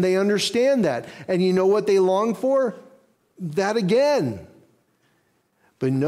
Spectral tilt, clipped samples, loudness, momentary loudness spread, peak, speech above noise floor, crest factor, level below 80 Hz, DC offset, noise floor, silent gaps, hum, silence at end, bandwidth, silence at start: -5.5 dB/octave; under 0.1%; -21 LUFS; 10 LU; -10 dBFS; 46 dB; 12 dB; -64 dBFS; under 0.1%; -66 dBFS; none; none; 0 s; 13.5 kHz; 0 s